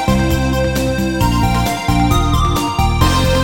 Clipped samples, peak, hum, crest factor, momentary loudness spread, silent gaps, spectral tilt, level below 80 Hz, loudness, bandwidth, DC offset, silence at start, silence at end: under 0.1%; 0 dBFS; none; 14 dB; 3 LU; none; -5.5 dB/octave; -20 dBFS; -15 LUFS; 18.5 kHz; under 0.1%; 0 s; 0 s